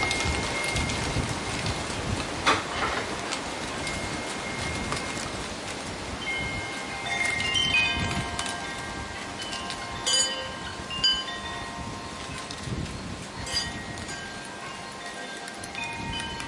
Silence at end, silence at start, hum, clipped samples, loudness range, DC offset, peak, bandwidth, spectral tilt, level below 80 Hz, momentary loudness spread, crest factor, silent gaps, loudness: 0 s; 0 s; none; under 0.1%; 7 LU; under 0.1%; -10 dBFS; 11.5 kHz; -2.5 dB/octave; -44 dBFS; 12 LU; 22 dB; none; -29 LUFS